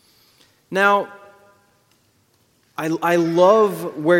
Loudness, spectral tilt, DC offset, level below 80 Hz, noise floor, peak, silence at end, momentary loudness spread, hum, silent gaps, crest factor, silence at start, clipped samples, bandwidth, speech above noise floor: -18 LUFS; -6 dB/octave; under 0.1%; -70 dBFS; -61 dBFS; -2 dBFS; 0 s; 14 LU; none; none; 18 dB; 0.7 s; under 0.1%; 16.5 kHz; 44 dB